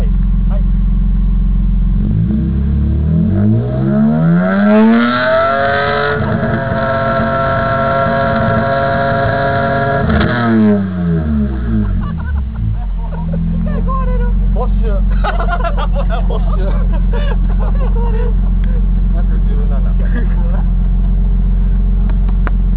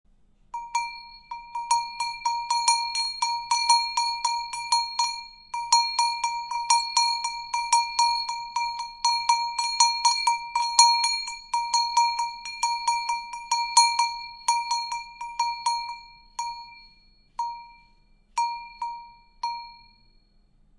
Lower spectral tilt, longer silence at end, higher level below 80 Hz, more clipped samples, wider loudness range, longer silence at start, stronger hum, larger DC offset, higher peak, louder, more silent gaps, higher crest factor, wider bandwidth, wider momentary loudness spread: first, -11.5 dB/octave vs 4.5 dB/octave; second, 0 s vs 1 s; first, -14 dBFS vs -60 dBFS; neither; second, 5 LU vs 13 LU; second, 0 s vs 0.55 s; neither; first, 2% vs under 0.1%; about the same, -2 dBFS vs -2 dBFS; first, -14 LUFS vs -24 LUFS; neither; second, 10 dB vs 24 dB; second, 4 kHz vs 11.5 kHz; second, 5 LU vs 15 LU